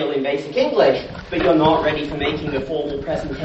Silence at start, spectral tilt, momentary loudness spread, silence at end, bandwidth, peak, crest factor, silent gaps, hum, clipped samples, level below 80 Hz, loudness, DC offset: 0 s; -6.5 dB/octave; 9 LU; 0 s; 8.2 kHz; -2 dBFS; 18 dB; none; none; under 0.1%; -40 dBFS; -19 LUFS; under 0.1%